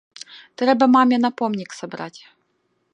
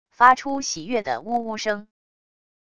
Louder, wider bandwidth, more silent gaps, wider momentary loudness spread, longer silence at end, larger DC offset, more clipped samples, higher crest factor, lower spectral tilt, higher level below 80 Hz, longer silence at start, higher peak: first, -18 LUFS vs -22 LUFS; about the same, 9.4 kHz vs 10 kHz; neither; first, 24 LU vs 11 LU; about the same, 0.85 s vs 0.75 s; second, under 0.1% vs 0.4%; neither; about the same, 18 dB vs 22 dB; first, -5 dB/octave vs -2.5 dB/octave; second, -74 dBFS vs -60 dBFS; first, 0.35 s vs 0.2 s; about the same, -2 dBFS vs -2 dBFS